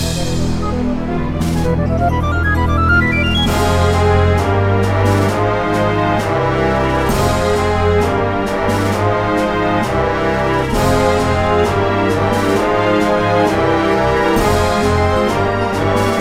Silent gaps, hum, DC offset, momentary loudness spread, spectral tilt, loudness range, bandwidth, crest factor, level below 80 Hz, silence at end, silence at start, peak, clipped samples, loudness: none; none; under 0.1%; 3 LU; -6 dB/octave; 2 LU; 16 kHz; 12 dB; -26 dBFS; 0 s; 0 s; -2 dBFS; under 0.1%; -15 LUFS